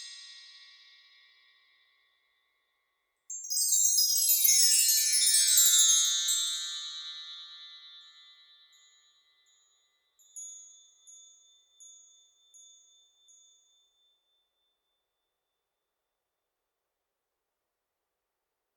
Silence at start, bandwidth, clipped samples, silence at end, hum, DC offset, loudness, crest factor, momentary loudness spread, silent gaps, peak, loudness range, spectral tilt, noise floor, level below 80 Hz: 0 s; over 20 kHz; under 0.1%; 8.15 s; none; under 0.1%; -22 LUFS; 24 dB; 25 LU; none; -8 dBFS; 18 LU; 10.5 dB/octave; -86 dBFS; under -90 dBFS